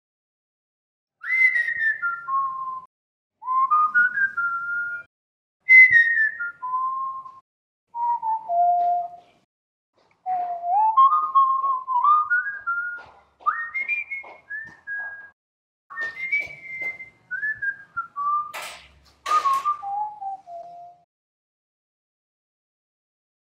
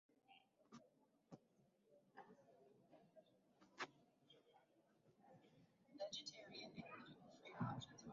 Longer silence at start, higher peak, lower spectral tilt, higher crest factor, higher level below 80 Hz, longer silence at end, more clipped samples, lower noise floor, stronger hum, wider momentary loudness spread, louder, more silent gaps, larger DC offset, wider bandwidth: first, 1.25 s vs 0.1 s; first, -4 dBFS vs -34 dBFS; second, -1.5 dB/octave vs -4 dB/octave; about the same, 20 dB vs 24 dB; first, -72 dBFS vs -86 dBFS; first, 2.55 s vs 0 s; neither; second, -51 dBFS vs -79 dBFS; neither; about the same, 18 LU vs 18 LU; first, -21 LUFS vs -54 LUFS; first, 2.85-3.30 s, 5.06-5.60 s, 7.41-7.87 s, 9.45-9.93 s, 15.33-15.90 s vs none; neither; first, 16 kHz vs 7.2 kHz